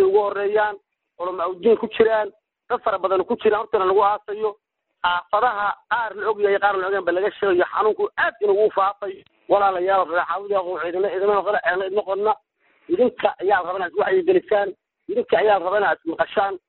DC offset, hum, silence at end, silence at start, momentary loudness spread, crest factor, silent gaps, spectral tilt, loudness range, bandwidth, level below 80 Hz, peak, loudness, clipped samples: under 0.1%; none; 0.1 s; 0 s; 8 LU; 16 dB; none; -2 dB/octave; 2 LU; 4.2 kHz; -60 dBFS; -4 dBFS; -21 LUFS; under 0.1%